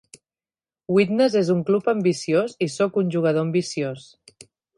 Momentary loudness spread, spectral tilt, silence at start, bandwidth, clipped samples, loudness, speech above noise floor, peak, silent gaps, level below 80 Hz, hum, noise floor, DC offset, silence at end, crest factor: 8 LU; -6 dB/octave; 0.9 s; 11.5 kHz; under 0.1%; -22 LUFS; over 69 dB; -6 dBFS; none; -68 dBFS; none; under -90 dBFS; under 0.1%; 0.8 s; 18 dB